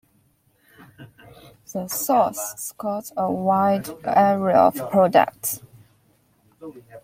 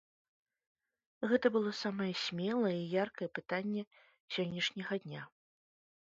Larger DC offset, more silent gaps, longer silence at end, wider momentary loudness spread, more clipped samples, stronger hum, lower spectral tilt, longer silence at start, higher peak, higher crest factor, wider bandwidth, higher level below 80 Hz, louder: neither; second, none vs 3.87-3.91 s, 4.20-4.28 s; second, 0.05 s vs 0.85 s; first, 16 LU vs 10 LU; neither; neither; about the same, -5 dB/octave vs -4 dB/octave; second, 1 s vs 1.2 s; first, -2 dBFS vs -18 dBFS; about the same, 20 dB vs 20 dB; first, 16.5 kHz vs 7.6 kHz; first, -64 dBFS vs -80 dBFS; first, -21 LUFS vs -36 LUFS